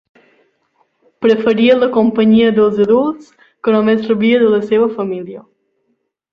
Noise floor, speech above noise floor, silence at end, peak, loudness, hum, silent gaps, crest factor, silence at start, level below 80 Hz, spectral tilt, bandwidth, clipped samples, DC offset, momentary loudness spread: -66 dBFS; 54 dB; 0.9 s; 0 dBFS; -13 LUFS; none; none; 14 dB; 1.2 s; -56 dBFS; -8 dB/octave; 5.6 kHz; under 0.1%; under 0.1%; 11 LU